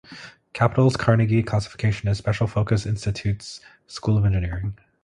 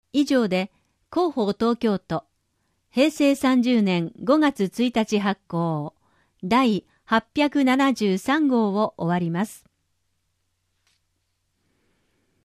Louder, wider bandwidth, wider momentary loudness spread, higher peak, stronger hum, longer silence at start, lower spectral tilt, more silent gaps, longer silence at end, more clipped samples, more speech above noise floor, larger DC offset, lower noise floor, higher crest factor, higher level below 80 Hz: about the same, -23 LUFS vs -22 LUFS; second, 10 kHz vs 15 kHz; first, 19 LU vs 10 LU; first, -2 dBFS vs -6 dBFS; neither; about the same, 0.1 s vs 0.15 s; about the same, -7 dB/octave vs -6 dB/octave; neither; second, 0.3 s vs 2.85 s; neither; second, 22 dB vs 52 dB; neither; second, -44 dBFS vs -73 dBFS; about the same, 20 dB vs 18 dB; first, -40 dBFS vs -62 dBFS